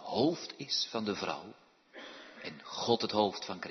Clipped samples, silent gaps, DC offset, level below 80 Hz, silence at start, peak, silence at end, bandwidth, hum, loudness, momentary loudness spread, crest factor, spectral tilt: under 0.1%; none; under 0.1%; -76 dBFS; 0 s; -14 dBFS; 0 s; 6.4 kHz; none; -34 LUFS; 18 LU; 22 dB; -4 dB/octave